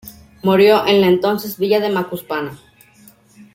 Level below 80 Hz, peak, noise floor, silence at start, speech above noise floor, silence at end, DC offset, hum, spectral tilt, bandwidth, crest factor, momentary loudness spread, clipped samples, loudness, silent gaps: -56 dBFS; -2 dBFS; -48 dBFS; 0.05 s; 33 dB; 1 s; under 0.1%; none; -6 dB/octave; 16.5 kHz; 16 dB; 13 LU; under 0.1%; -16 LUFS; none